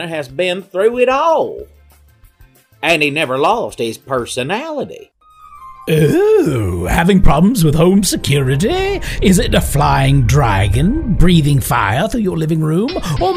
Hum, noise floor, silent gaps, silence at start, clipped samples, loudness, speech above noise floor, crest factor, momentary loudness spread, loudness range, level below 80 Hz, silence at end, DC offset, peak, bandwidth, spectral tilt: none; -47 dBFS; none; 0 s; under 0.1%; -14 LUFS; 34 dB; 14 dB; 8 LU; 5 LU; -24 dBFS; 0 s; under 0.1%; 0 dBFS; 16 kHz; -5.5 dB/octave